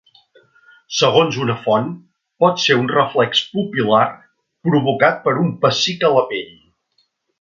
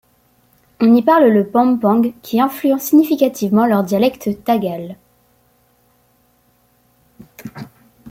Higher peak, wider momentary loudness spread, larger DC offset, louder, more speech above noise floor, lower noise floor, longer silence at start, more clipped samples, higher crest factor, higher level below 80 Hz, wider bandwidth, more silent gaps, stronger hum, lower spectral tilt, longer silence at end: about the same, 0 dBFS vs -2 dBFS; second, 10 LU vs 22 LU; neither; about the same, -17 LUFS vs -15 LUFS; first, 49 dB vs 44 dB; first, -65 dBFS vs -58 dBFS; about the same, 0.9 s vs 0.8 s; neither; about the same, 18 dB vs 16 dB; about the same, -62 dBFS vs -60 dBFS; second, 7.6 kHz vs 16.5 kHz; neither; neither; second, -4.5 dB/octave vs -6.5 dB/octave; first, 0.95 s vs 0 s